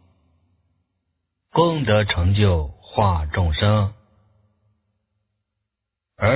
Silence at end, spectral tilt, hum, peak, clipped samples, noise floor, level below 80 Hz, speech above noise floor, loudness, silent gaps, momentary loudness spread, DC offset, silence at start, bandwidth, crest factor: 0 s; -11 dB/octave; none; -2 dBFS; under 0.1%; -83 dBFS; -32 dBFS; 65 dB; -20 LUFS; none; 7 LU; under 0.1%; 1.55 s; 4 kHz; 20 dB